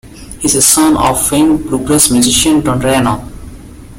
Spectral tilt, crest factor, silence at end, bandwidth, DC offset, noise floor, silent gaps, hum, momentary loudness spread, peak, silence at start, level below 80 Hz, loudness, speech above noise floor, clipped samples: -3.5 dB/octave; 12 dB; 0 s; over 20 kHz; under 0.1%; -31 dBFS; none; none; 9 LU; 0 dBFS; 0.05 s; -32 dBFS; -10 LUFS; 21 dB; 0.1%